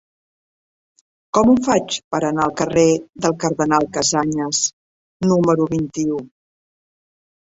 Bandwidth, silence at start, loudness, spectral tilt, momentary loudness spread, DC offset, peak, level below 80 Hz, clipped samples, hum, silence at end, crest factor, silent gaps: 8 kHz; 1.35 s; -18 LUFS; -4.5 dB/octave; 7 LU; under 0.1%; -2 dBFS; -52 dBFS; under 0.1%; none; 1.3 s; 18 dB; 2.04-2.11 s, 4.73-5.20 s